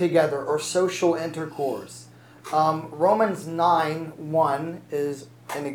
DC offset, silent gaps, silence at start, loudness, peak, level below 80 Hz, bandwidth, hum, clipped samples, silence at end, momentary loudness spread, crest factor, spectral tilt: under 0.1%; none; 0 s; -24 LUFS; -8 dBFS; -74 dBFS; over 20 kHz; none; under 0.1%; 0 s; 13 LU; 16 dB; -5 dB/octave